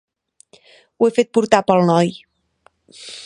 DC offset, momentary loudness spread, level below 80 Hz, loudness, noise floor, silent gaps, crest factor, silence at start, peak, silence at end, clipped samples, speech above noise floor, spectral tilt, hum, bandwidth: under 0.1%; 14 LU; -62 dBFS; -16 LUFS; -58 dBFS; none; 20 dB; 1 s; 0 dBFS; 0 s; under 0.1%; 42 dB; -6 dB/octave; none; 11 kHz